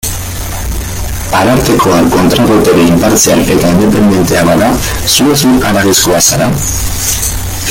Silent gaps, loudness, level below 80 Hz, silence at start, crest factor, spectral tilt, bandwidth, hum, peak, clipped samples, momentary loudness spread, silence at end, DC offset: none; -8 LUFS; -22 dBFS; 0.05 s; 8 dB; -4 dB/octave; over 20 kHz; none; 0 dBFS; 0.1%; 11 LU; 0 s; under 0.1%